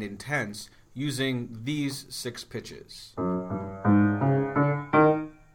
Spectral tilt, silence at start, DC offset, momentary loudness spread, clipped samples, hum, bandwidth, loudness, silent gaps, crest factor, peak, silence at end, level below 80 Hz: -6.5 dB/octave; 0 s; under 0.1%; 17 LU; under 0.1%; none; 17.5 kHz; -27 LUFS; none; 18 dB; -8 dBFS; 0.2 s; -58 dBFS